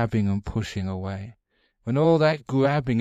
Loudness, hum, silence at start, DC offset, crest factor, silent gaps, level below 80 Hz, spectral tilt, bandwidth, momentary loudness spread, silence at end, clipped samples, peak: -24 LUFS; none; 0 s; under 0.1%; 16 dB; none; -48 dBFS; -7.5 dB/octave; 9 kHz; 16 LU; 0 s; under 0.1%; -8 dBFS